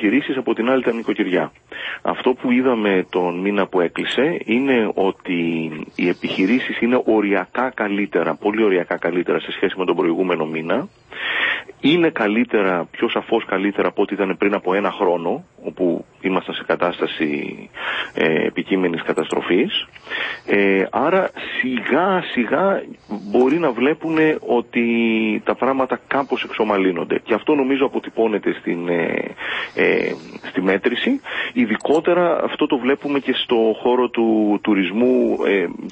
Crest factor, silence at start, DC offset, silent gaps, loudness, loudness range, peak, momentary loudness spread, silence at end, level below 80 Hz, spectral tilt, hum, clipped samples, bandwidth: 16 dB; 0 s; under 0.1%; none; -19 LUFS; 2 LU; -2 dBFS; 6 LU; 0 s; -60 dBFS; -6.5 dB/octave; none; under 0.1%; 8.6 kHz